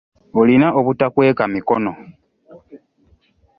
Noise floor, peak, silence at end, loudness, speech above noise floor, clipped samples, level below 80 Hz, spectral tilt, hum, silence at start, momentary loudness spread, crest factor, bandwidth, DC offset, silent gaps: -57 dBFS; -2 dBFS; 0.8 s; -16 LUFS; 42 dB; under 0.1%; -54 dBFS; -10.5 dB/octave; none; 0.35 s; 11 LU; 16 dB; 5.2 kHz; under 0.1%; none